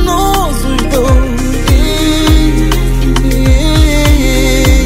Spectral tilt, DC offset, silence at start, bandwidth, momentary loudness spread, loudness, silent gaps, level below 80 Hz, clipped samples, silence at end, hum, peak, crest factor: -5 dB/octave; under 0.1%; 0 s; 16.5 kHz; 4 LU; -11 LUFS; none; -10 dBFS; 0.2%; 0 s; none; 0 dBFS; 8 dB